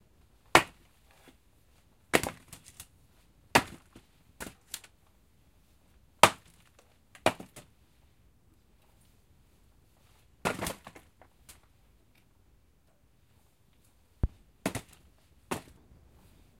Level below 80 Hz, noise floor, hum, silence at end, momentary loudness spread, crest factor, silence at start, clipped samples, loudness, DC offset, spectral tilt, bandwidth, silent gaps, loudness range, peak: -52 dBFS; -67 dBFS; none; 1 s; 27 LU; 34 dB; 0.55 s; under 0.1%; -30 LUFS; under 0.1%; -3 dB/octave; 16 kHz; none; 11 LU; -2 dBFS